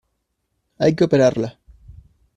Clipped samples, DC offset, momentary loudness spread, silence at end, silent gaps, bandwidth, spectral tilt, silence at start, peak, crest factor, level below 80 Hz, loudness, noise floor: under 0.1%; under 0.1%; 12 LU; 0.45 s; none; 10.5 kHz; -7 dB/octave; 0.8 s; -4 dBFS; 18 dB; -52 dBFS; -18 LUFS; -73 dBFS